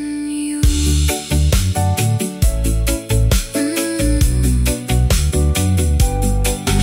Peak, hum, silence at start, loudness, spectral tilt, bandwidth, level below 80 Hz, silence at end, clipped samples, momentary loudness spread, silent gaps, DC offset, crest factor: -4 dBFS; none; 0 s; -17 LUFS; -5 dB/octave; 16.5 kHz; -18 dBFS; 0 s; under 0.1%; 3 LU; none; under 0.1%; 12 dB